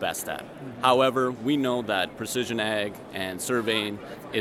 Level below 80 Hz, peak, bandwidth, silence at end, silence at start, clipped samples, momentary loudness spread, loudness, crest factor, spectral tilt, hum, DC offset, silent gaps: -64 dBFS; -4 dBFS; 16 kHz; 0 s; 0 s; under 0.1%; 12 LU; -26 LUFS; 22 dB; -4 dB/octave; none; under 0.1%; none